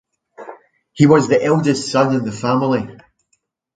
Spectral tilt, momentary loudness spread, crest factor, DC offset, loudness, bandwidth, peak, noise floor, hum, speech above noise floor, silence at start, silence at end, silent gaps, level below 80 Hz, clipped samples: -6.5 dB/octave; 23 LU; 18 dB; under 0.1%; -16 LUFS; 9.2 kHz; 0 dBFS; -67 dBFS; none; 52 dB; 0.4 s; 0.85 s; none; -56 dBFS; under 0.1%